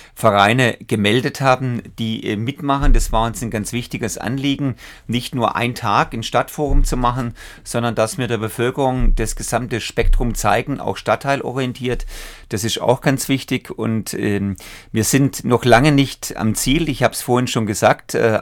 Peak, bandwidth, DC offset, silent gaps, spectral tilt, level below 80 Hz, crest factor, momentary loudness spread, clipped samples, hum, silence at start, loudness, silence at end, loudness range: 0 dBFS; 18 kHz; under 0.1%; none; -5 dB/octave; -26 dBFS; 18 dB; 9 LU; under 0.1%; none; 0 s; -19 LUFS; 0 s; 4 LU